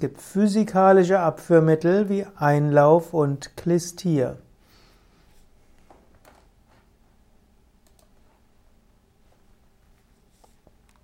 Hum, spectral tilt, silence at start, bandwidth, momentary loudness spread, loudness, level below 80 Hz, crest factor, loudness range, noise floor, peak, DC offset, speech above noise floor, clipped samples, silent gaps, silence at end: none; -7.5 dB/octave; 0 s; 15.5 kHz; 9 LU; -20 LUFS; -58 dBFS; 20 dB; 13 LU; -59 dBFS; -4 dBFS; under 0.1%; 39 dB; under 0.1%; none; 6.65 s